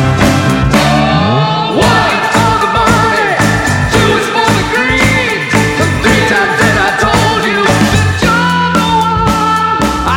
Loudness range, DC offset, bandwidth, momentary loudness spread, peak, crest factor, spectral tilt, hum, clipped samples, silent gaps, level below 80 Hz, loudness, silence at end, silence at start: 0 LU; under 0.1%; 17.5 kHz; 2 LU; 0 dBFS; 10 dB; -4.5 dB/octave; none; under 0.1%; none; -26 dBFS; -10 LUFS; 0 s; 0 s